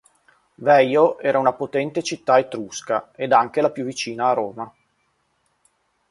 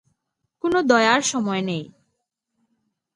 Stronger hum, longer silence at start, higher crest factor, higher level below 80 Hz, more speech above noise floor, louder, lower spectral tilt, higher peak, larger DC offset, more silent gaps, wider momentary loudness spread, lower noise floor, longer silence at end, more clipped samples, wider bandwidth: neither; about the same, 0.6 s vs 0.65 s; about the same, 20 dB vs 20 dB; about the same, -68 dBFS vs -66 dBFS; second, 48 dB vs 57 dB; about the same, -20 LUFS vs -20 LUFS; about the same, -4.5 dB/octave vs -3.5 dB/octave; about the same, -2 dBFS vs -2 dBFS; neither; neither; about the same, 12 LU vs 12 LU; second, -68 dBFS vs -77 dBFS; first, 1.45 s vs 1.3 s; neither; about the same, 11.5 kHz vs 11.5 kHz